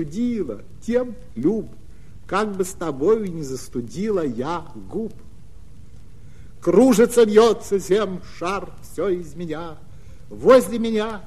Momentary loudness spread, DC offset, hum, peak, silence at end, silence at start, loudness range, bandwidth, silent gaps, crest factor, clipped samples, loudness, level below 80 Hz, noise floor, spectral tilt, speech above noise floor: 16 LU; 2%; none; -2 dBFS; 0.05 s; 0 s; 7 LU; 14 kHz; none; 20 dB; under 0.1%; -21 LUFS; -46 dBFS; -44 dBFS; -5.5 dB/octave; 24 dB